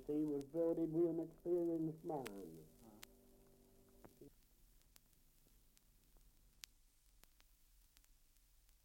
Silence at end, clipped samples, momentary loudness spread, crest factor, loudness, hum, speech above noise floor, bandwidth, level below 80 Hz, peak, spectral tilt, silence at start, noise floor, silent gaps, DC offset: 4.55 s; under 0.1%; 23 LU; 20 dB; -42 LUFS; none; 30 dB; 16.5 kHz; -72 dBFS; -26 dBFS; -7.5 dB/octave; 0 s; -72 dBFS; none; under 0.1%